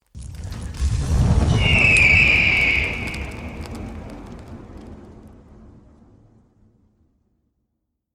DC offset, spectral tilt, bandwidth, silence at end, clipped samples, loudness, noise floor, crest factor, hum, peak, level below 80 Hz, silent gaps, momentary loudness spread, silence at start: under 0.1%; -4.5 dB/octave; 13 kHz; 2.85 s; under 0.1%; -16 LUFS; -76 dBFS; 18 dB; none; -2 dBFS; -30 dBFS; none; 26 LU; 0.15 s